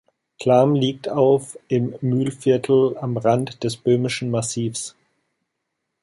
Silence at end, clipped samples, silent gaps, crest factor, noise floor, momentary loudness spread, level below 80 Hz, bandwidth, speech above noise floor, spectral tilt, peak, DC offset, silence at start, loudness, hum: 1.15 s; under 0.1%; none; 18 dB; -78 dBFS; 9 LU; -62 dBFS; 11.5 kHz; 58 dB; -6 dB/octave; -2 dBFS; under 0.1%; 0.4 s; -20 LUFS; none